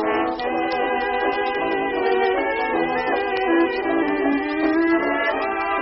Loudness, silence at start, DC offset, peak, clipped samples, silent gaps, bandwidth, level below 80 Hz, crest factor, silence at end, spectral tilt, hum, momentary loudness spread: -21 LUFS; 0 s; under 0.1%; -8 dBFS; under 0.1%; none; 5.8 kHz; -50 dBFS; 12 dB; 0 s; -2 dB/octave; none; 3 LU